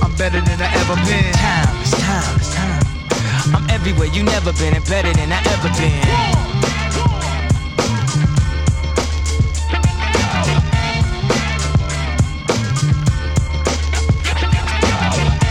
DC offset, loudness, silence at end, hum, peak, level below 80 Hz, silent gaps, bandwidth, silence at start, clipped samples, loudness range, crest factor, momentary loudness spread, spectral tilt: under 0.1%; -17 LUFS; 0 s; none; -2 dBFS; -22 dBFS; none; 12.5 kHz; 0 s; under 0.1%; 1 LU; 12 dB; 3 LU; -5 dB/octave